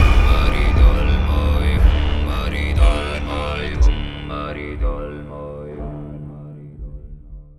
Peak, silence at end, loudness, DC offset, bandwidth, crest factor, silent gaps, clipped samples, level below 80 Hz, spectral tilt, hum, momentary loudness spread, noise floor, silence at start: 0 dBFS; 0.15 s; -20 LUFS; under 0.1%; 12 kHz; 16 dB; none; under 0.1%; -18 dBFS; -6.5 dB/octave; none; 20 LU; -37 dBFS; 0 s